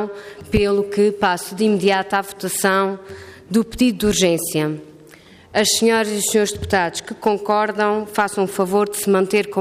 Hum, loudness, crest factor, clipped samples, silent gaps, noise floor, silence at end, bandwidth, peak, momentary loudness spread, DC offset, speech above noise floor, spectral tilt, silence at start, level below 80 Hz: none; -19 LUFS; 14 dB; under 0.1%; none; -45 dBFS; 0 s; 15.5 kHz; -4 dBFS; 8 LU; under 0.1%; 27 dB; -4 dB/octave; 0 s; -44 dBFS